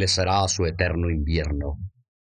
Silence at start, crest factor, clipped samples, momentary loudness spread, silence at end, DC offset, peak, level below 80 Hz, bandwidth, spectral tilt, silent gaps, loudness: 0 s; 20 dB; under 0.1%; 13 LU; 0.5 s; under 0.1%; -4 dBFS; -30 dBFS; 10 kHz; -4 dB/octave; none; -24 LUFS